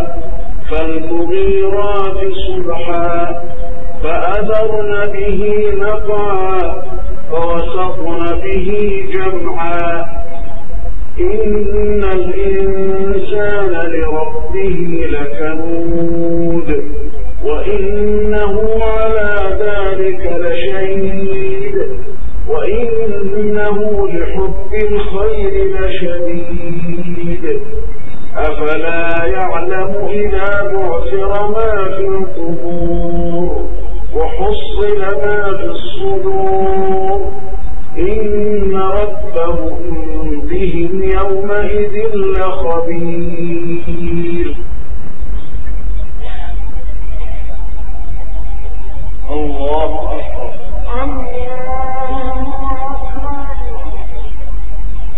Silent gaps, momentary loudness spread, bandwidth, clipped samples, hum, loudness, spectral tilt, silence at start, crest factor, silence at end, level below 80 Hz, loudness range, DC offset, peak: none; 12 LU; 4 kHz; 0.4%; none; -17 LUFS; -9.5 dB/octave; 0 s; 14 dB; 0 s; -24 dBFS; 6 LU; 60%; 0 dBFS